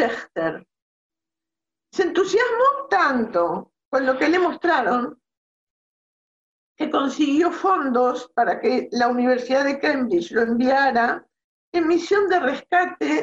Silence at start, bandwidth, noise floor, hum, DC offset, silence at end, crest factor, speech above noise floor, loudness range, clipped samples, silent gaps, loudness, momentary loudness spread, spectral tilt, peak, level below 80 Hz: 0 s; 8 kHz; -89 dBFS; none; under 0.1%; 0 s; 14 dB; 69 dB; 4 LU; under 0.1%; 0.82-1.10 s, 3.85-3.91 s, 5.37-6.75 s, 11.44-11.72 s; -21 LUFS; 7 LU; -4.5 dB/octave; -8 dBFS; -64 dBFS